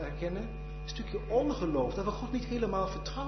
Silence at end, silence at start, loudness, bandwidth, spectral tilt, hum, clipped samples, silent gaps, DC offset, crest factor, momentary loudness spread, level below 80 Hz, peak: 0 s; 0 s; -34 LUFS; 6.2 kHz; -6 dB/octave; none; under 0.1%; none; under 0.1%; 16 dB; 10 LU; -42 dBFS; -18 dBFS